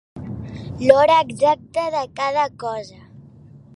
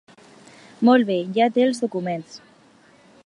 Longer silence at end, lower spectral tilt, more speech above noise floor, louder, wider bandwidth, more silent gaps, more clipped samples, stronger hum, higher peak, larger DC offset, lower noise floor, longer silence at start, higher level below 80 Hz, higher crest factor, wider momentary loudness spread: second, 0.2 s vs 0.9 s; about the same, -5.5 dB/octave vs -6 dB/octave; second, 27 dB vs 34 dB; about the same, -18 LUFS vs -20 LUFS; about the same, 11.5 kHz vs 11 kHz; neither; neither; neither; first, 0 dBFS vs -4 dBFS; neither; second, -45 dBFS vs -53 dBFS; second, 0.15 s vs 0.8 s; first, -50 dBFS vs -76 dBFS; about the same, 20 dB vs 18 dB; first, 19 LU vs 13 LU